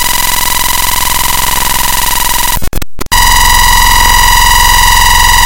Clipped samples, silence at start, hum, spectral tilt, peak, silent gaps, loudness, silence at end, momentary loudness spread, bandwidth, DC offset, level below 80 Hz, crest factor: 2%; 0 s; none; -0.5 dB/octave; 0 dBFS; none; -6 LUFS; 0 s; 6 LU; over 20 kHz; under 0.1%; -14 dBFS; 8 dB